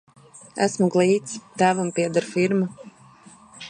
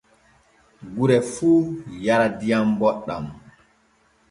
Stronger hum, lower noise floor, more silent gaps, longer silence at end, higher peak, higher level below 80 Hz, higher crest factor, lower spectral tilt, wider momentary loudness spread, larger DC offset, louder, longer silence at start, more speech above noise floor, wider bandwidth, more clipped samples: neither; second, -49 dBFS vs -61 dBFS; neither; second, 0 s vs 0.9 s; about the same, -6 dBFS vs -4 dBFS; second, -70 dBFS vs -56 dBFS; about the same, 18 dB vs 18 dB; about the same, -5.5 dB/octave vs -6.5 dB/octave; second, 8 LU vs 13 LU; neither; about the same, -22 LUFS vs -21 LUFS; second, 0.35 s vs 0.8 s; second, 28 dB vs 41 dB; about the same, 10.5 kHz vs 11.5 kHz; neither